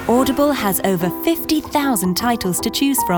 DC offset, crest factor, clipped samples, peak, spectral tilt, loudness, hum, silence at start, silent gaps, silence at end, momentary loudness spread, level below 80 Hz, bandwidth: under 0.1%; 14 dB; under 0.1%; -4 dBFS; -4 dB/octave; -18 LUFS; none; 0 s; none; 0 s; 3 LU; -44 dBFS; over 20 kHz